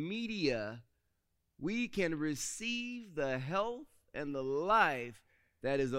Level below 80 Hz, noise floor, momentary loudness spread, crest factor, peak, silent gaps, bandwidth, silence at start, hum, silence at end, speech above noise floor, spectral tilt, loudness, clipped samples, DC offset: -62 dBFS; -80 dBFS; 14 LU; 22 dB; -16 dBFS; none; 16 kHz; 0 s; none; 0 s; 45 dB; -4.5 dB/octave; -36 LUFS; under 0.1%; under 0.1%